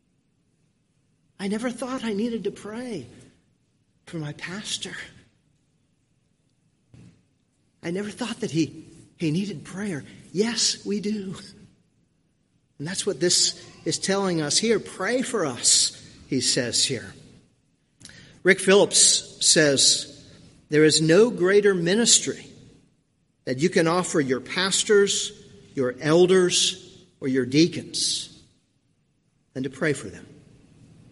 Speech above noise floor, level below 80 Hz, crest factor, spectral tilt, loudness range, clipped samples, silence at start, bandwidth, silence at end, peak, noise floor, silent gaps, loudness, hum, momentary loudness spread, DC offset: 45 dB; -64 dBFS; 22 dB; -3 dB/octave; 16 LU; under 0.1%; 1.4 s; 11.5 kHz; 0.8 s; -2 dBFS; -68 dBFS; none; -22 LUFS; none; 18 LU; under 0.1%